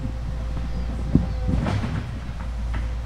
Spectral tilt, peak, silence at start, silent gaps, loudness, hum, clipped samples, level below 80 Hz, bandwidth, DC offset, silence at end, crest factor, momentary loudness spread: -7.5 dB/octave; -2 dBFS; 0 s; none; -27 LUFS; none; under 0.1%; -28 dBFS; 9.6 kHz; under 0.1%; 0 s; 22 dB; 8 LU